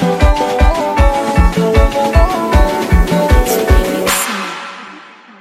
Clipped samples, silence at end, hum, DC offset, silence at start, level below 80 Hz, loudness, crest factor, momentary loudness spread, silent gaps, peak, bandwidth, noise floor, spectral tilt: under 0.1%; 0.4 s; none; under 0.1%; 0 s; -14 dBFS; -13 LUFS; 12 dB; 9 LU; none; 0 dBFS; 16 kHz; -36 dBFS; -5.5 dB/octave